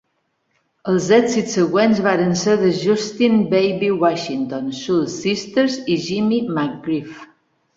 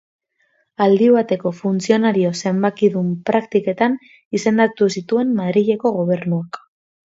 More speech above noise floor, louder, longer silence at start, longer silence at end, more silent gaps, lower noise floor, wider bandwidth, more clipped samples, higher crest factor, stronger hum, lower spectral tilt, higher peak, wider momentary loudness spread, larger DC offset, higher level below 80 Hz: first, 51 dB vs 47 dB; about the same, -18 LUFS vs -18 LUFS; about the same, 0.85 s vs 0.8 s; about the same, 0.5 s vs 0.55 s; second, none vs 4.25-4.31 s; first, -69 dBFS vs -64 dBFS; about the same, 7.8 kHz vs 7.8 kHz; neither; about the same, 16 dB vs 16 dB; neither; about the same, -5.5 dB/octave vs -6.5 dB/octave; about the same, -2 dBFS vs -2 dBFS; about the same, 9 LU vs 8 LU; neither; first, -60 dBFS vs -66 dBFS